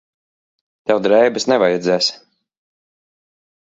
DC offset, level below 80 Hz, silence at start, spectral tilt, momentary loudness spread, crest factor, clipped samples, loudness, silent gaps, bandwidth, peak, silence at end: under 0.1%; -64 dBFS; 0.85 s; -4 dB/octave; 6 LU; 18 dB; under 0.1%; -16 LUFS; none; 7.8 kHz; 0 dBFS; 1.55 s